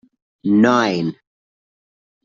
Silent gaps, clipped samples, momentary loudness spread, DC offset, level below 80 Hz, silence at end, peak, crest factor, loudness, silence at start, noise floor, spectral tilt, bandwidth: none; under 0.1%; 13 LU; under 0.1%; -62 dBFS; 1.1 s; -2 dBFS; 18 dB; -17 LUFS; 0.45 s; under -90 dBFS; -6 dB/octave; 7.4 kHz